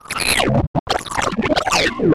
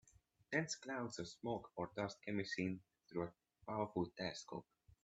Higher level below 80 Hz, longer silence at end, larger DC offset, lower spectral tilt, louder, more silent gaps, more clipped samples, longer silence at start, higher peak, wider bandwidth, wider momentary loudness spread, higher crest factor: first, -34 dBFS vs -76 dBFS; about the same, 0 s vs 0.1 s; neither; about the same, -4 dB/octave vs -5 dB/octave; first, -18 LUFS vs -45 LUFS; first, 0.67-0.74 s, 0.80-0.86 s vs none; neither; second, 0.1 s vs 0.5 s; first, -6 dBFS vs -24 dBFS; first, 15.5 kHz vs 8.4 kHz; second, 6 LU vs 9 LU; second, 12 dB vs 22 dB